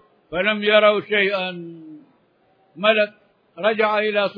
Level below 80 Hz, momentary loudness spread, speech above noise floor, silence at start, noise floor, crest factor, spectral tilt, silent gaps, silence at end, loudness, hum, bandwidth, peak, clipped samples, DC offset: -64 dBFS; 13 LU; 41 dB; 0.3 s; -60 dBFS; 18 dB; -7 dB/octave; none; 0 s; -19 LUFS; none; 5.2 kHz; -2 dBFS; under 0.1%; under 0.1%